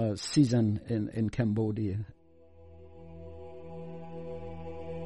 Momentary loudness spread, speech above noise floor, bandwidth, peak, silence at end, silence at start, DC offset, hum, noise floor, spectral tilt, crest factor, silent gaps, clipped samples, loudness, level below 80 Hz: 22 LU; 29 dB; 11.5 kHz; -12 dBFS; 0 s; 0 s; under 0.1%; none; -58 dBFS; -7 dB/octave; 20 dB; none; under 0.1%; -31 LUFS; -56 dBFS